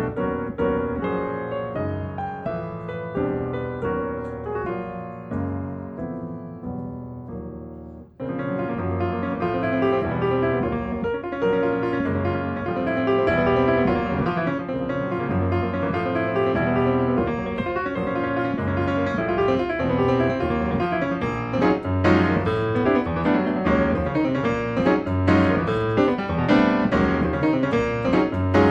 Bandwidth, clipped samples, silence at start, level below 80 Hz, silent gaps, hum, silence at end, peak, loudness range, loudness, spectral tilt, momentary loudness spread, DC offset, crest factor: 8 kHz; under 0.1%; 0 s; -42 dBFS; none; none; 0 s; -4 dBFS; 9 LU; -23 LUFS; -8.5 dB/octave; 12 LU; under 0.1%; 18 dB